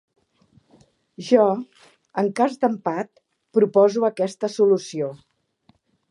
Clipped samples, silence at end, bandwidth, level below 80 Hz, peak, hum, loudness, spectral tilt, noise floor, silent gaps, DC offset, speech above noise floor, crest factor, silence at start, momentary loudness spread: under 0.1%; 0.95 s; 11 kHz; -76 dBFS; -4 dBFS; none; -21 LUFS; -6 dB/octave; -62 dBFS; none; under 0.1%; 42 dB; 20 dB; 1.2 s; 13 LU